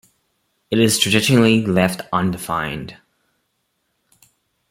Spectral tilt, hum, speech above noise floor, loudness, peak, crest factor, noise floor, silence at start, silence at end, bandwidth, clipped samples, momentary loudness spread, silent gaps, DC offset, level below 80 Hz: -4.5 dB/octave; none; 53 dB; -17 LUFS; -2 dBFS; 18 dB; -70 dBFS; 0.7 s; 1.8 s; 16.5 kHz; under 0.1%; 12 LU; none; under 0.1%; -52 dBFS